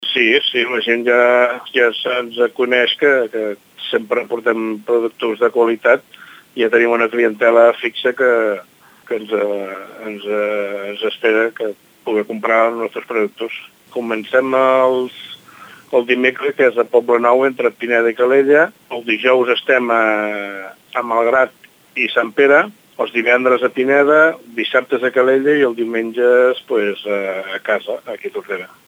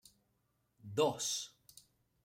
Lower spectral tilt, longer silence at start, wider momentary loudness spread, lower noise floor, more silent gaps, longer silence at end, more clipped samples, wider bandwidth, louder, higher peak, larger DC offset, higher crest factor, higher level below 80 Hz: first, -4.5 dB/octave vs -3 dB/octave; second, 0 s vs 0.85 s; second, 13 LU vs 17 LU; second, -41 dBFS vs -80 dBFS; neither; second, 0.2 s vs 0.75 s; neither; about the same, 15.5 kHz vs 16 kHz; first, -15 LUFS vs -36 LUFS; first, 0 dBFS vs -20 dBFS; neither; second, 16 dB vs 22 dB; first, -72 dBFS vs -80 dBFS